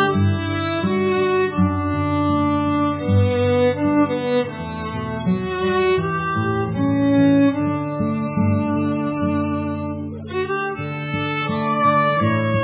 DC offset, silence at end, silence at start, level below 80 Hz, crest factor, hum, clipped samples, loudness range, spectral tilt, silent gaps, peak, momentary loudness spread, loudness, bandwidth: under 0.1%; 0 s; 0 s; -38 dBFS; 14 dB; none; under 0.1%; 3 LU; -11.5 dB/octave; none; -6 dBFS; 8 LU; -20 LUFS; 4 kHz